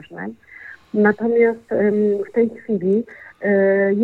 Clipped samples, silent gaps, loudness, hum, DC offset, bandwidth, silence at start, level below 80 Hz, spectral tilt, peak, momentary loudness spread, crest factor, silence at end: under 0.1%; none; -19 LUFS; none; under 0.1%; 4.2 kHz; 0.1 s; -66 dBFS; -10 dB/octave; -4 dBFS; 18 LU; 16 dB; 0 s